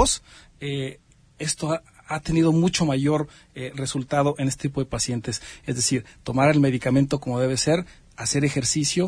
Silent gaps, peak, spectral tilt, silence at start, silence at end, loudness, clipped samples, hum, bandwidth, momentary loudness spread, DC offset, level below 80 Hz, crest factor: none; -4 dBFS; -4.5 dB/octave; 0 s; 0 s; -23 LUFS; under 0.1%; none; 11 kHz; 11 LU; under 0.1%; -46 dBFS; 20 dB